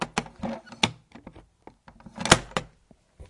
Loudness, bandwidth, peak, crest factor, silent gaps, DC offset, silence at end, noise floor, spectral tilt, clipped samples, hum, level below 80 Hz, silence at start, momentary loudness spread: -26 LUFS; 12 kHz; 0 dBFS; 30 dB; none; under 0.1%; 0.05 s; -60 dBFS; -3 dB/octave; under 0.1%; none; -50 dBFS; 0 s; 18 LU